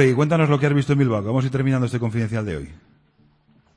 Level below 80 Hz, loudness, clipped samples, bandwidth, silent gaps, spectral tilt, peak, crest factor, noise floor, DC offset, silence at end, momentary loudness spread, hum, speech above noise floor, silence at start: -50 dBFS; -20 LUFS; under 0.1%; 10.5 kHz; none; -8 dB/octave; -4 dBFS; 16 dB; -59 dBFS; under 0.1%; 1 s; 10 LU; none; 39 dB; 0 s